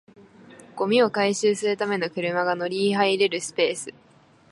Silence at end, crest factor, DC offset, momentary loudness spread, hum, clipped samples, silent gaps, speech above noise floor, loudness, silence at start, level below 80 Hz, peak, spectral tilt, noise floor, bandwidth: 0.6 s; 18 dB; under 0.1%; 8 LU; none; under 0.1%; none; 25 dB; -23 LUFS; 0.5 s; -74 dBFS; -6 dBFS; -4 dB/octave; -48 dBFS; 11.5 kHz